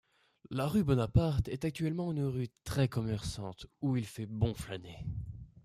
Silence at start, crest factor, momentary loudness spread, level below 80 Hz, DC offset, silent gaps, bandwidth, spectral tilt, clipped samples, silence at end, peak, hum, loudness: 0.5 s; 20 dB; 13 LU; -50 dBFS; under 0.1%; none; 15 kHz; -7 dB/octave; under 0.1%; 0.2 s; -14 dBFS; none; -35 LUFS